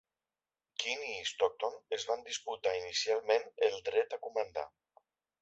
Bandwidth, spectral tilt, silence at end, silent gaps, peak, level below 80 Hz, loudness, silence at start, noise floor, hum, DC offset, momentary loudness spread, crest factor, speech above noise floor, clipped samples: 8 kHz; 2 dB/octave; 0.75 s; none; -16 dBFS; -76 dBFS; -35 LUFS; 0.8 s; under -90 dBFS; none; under 0.1%; 8 LU; 20 dB; over 55 dB; under 0.1%